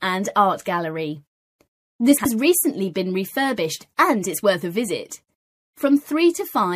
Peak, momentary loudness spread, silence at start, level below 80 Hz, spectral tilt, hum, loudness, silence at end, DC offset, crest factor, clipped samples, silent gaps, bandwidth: -4 dBFS; 10 LU; 0 s; -64 dBFS; -4 dB/octave; none; -21 LUFS; 0 s; under 0.1%; 18 dB; under 0.1%; 1.27-1.59 s, 1.68-1.99 s, 5.35-5.73 s; 15.5 kHz